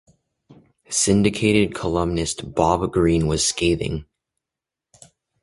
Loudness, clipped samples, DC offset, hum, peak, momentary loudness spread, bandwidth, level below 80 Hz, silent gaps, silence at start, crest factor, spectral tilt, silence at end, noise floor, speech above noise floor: -20 LUFS; under 0.1%; under 0.1%; none; -2 dBFS; 7 LU; 11.5 kHz; -38 dBFS; none; 0.5 s; 20 dB; -4.5 dB/octave; 1.4 s; -87 dBFS; 67 dB